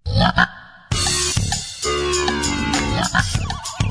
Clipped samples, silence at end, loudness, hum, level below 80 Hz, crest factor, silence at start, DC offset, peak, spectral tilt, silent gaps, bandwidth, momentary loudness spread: under 0.1%; 0 s; -19 LUFS; none; -30 dBFS; 18 dB; 0.05 s; under 0.1%; -2 dBFS; -3.5 dB/octave; none; 11 kHz; 6 LU